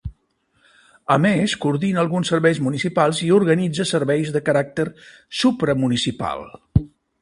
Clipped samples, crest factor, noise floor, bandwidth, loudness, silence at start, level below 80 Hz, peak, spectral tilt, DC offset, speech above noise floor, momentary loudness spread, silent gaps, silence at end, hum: under 0.1%; 20 dB; -65 dBFS; 11.5 kHz; -20 LUFS; 0.05 s; -42 dBFS; 0 dBFS; -5.5 dB/octave; under 0.1%; 46 dB; 11 LU; none; 0.35 s; none